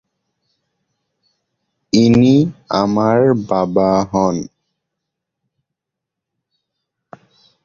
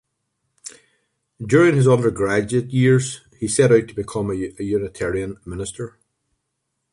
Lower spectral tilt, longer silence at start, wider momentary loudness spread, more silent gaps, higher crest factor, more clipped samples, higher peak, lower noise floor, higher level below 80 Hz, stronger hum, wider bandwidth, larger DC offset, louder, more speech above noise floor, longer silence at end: about the same, -7 dB/octave vs -6 dB/octave; first, 1.95 s vs 0.65 s; second, 8 LU vs 19 LU; neither; about the same, 16 dB vs 18 dB; neither; about the same, -2 dBFS vs -4 dBFS; first, -82 dBFS vs -76 dBFS; about the same, -48 dBFS vs -48 dBFS; neither; second, 7.2 kHz vs 11.5 kHz; neither; first, -14 LUFS vs -19 LUFS; first, 68 dB vs 57 dB; first, 3.2 s vs 1.05 s